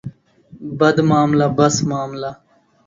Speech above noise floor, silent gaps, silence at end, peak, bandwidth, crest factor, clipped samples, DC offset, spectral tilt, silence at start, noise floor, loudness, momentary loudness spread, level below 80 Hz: 30 dB; none; 0.55 s; 0 dBFS; 7.8 kHz; 18 dB; under 0.1%; under 0.1%; -5.5 dB/octave; 0.05 s; -46 dBFS; -16 LUFS; 17 LU; -52 dBFS